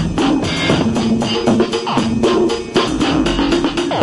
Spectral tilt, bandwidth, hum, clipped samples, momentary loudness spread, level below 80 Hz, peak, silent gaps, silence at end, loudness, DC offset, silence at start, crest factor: -5 dB/octave; 11.5 kHz; none; under 0.1%; 2 LU; -34 dBFS; -2 dBFS; none; 0 s; -16 LUFS; under 0.1%; 0 s; 14 dB